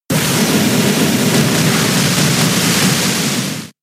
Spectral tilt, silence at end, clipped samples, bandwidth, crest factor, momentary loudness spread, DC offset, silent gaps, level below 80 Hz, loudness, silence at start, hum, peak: -3.5 dB/octave; 0.1 s; under 0.1%; 16 kHz; 12 dB; 3 LU; under 0.1%; none; -46 dBFS; -13 LUFS; 0.1 s; none; -2 dBFS